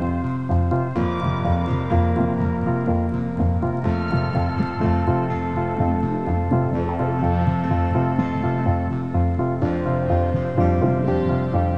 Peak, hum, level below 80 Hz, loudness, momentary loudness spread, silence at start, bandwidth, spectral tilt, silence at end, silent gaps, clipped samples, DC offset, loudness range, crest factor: -6 dBFS; none; -34 dBFS; -22 LUFS; 3 LU; 0 s; 5.6 kHz; -10 dB/octave; 0 s; none; under 0.1%; 1%; 1 LU; 16 dB